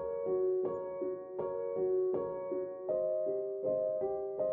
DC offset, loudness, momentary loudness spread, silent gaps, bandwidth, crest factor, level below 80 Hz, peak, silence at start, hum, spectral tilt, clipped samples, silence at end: under 0.1%; -35 LUFS; 6 LU; none; 2.4 kHz; 12 dB; -72 dBFS; -24 dBFS; 0 s; none; -10 dB/octave; under 0.1%; 0 s